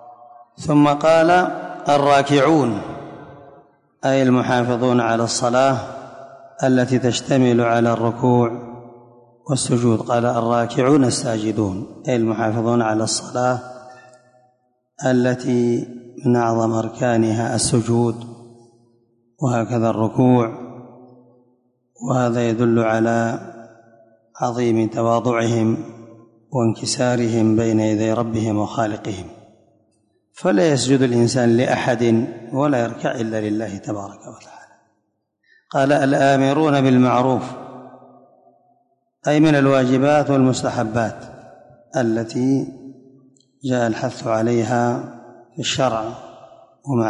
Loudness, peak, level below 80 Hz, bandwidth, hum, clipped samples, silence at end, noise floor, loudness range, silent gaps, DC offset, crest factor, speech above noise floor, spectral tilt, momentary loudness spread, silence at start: -18 LUFS; -4 dBFS; -54 dBFS; 11 kHz; none; under 0.1%; 0 s; -71 dBFS; 4 LU; none; under 0.1%; 14 dB; 53 dB; -6 dB/octave; 15 LU; 0.05 s